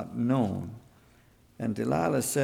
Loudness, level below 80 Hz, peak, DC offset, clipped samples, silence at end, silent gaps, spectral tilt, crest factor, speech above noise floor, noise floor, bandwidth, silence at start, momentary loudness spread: -29 LUFS; -60 dBFS; -14 dBFS; under 0.1%; under 0.1%; 0 s; none; -6 dB/octave; 16 dB; 32 dB; -60 dBFS; 19.5 kHz; 0 s; 13 LU